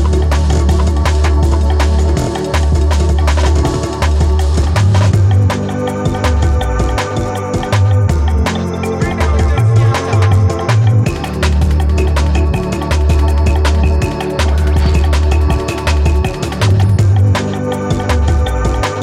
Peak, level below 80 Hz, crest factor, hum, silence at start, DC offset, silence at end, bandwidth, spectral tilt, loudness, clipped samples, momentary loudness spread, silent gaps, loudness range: 0 dBFS; -16 dBFS; 10 dB; none; 0 s; under 0.1%; 0 s; 12.5 kHz; -6.5 dB/octave; -13 LUFS; under 0.1%; 6 LU; none; 1 LU